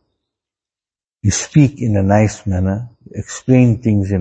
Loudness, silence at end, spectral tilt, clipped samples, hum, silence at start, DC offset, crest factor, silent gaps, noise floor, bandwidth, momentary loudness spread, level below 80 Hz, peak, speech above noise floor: -15 LUFS; 0 s; -6.5 dB/octave; under 0.1%; none; 1.25 s; under 0.1%; 16 dB; none; under -90 dBFS; 8.6 kHz; 13 LU; -42 dBFS; 0 dBFS; over 76 dB